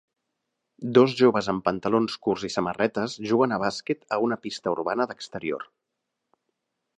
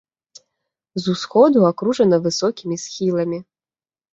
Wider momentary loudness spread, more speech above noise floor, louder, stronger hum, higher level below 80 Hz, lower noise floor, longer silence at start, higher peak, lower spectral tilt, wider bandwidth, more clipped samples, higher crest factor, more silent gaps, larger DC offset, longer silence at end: about the same, 11 LU vs 13 LU; second, 57 dB vs over 73 dB; second, -25 LUFS vs -18 LUFS; neither; about the same, -64 dBFS vs -64 dBFS; second, -82 dBFS vs under -90 dBFS; second, 0.8 s vs 0.95 s; about the same, -4 dBFS vs -2 dBFS; about the same, -5.5 dB/octave vs -6 dB/octave; first, 9.8 kHz vs 8 kHz; neither; about the same, 22 dB vs 18 dB; neither; neither; first, 1.35 s vs 0.7 s